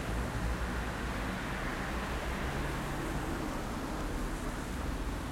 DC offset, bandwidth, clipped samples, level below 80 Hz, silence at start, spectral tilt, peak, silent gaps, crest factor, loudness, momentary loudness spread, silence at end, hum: under 0.1%; 16.5 kHz; under 0.1%; -40 dBFS; 0 s; -5 dB/octave; -24 dBFS; none; 12 dB; -37 LUFS; 2 LU; 0 s; none